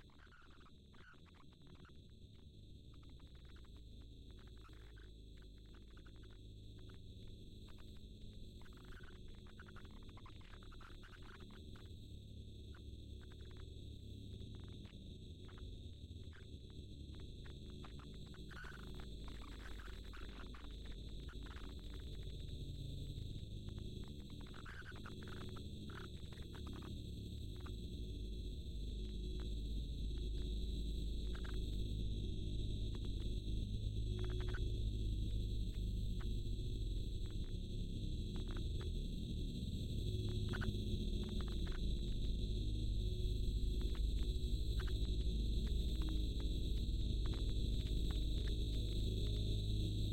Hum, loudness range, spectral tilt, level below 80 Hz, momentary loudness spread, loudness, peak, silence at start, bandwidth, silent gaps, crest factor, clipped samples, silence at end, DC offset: none; 16 LU; -6.5 dB/octave; -46 dBFS; 17 LU; -46 LUFS; -28 dBFS; 0 s; 13 kHz; none; 16 dB; under 0.1%; 0 s; under 0.1%